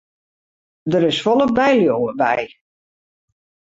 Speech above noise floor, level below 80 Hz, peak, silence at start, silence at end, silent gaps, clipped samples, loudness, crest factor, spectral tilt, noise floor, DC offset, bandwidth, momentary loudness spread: over 74 dB; -56 dBFS; -4 dBFS; 0.85 s; 1.3 s; none; under 0.1%; -17 LUFS; 16 dB; -6 dB/octave; under -90 dBFS; under 0.1%; 8 kHz; 9 LU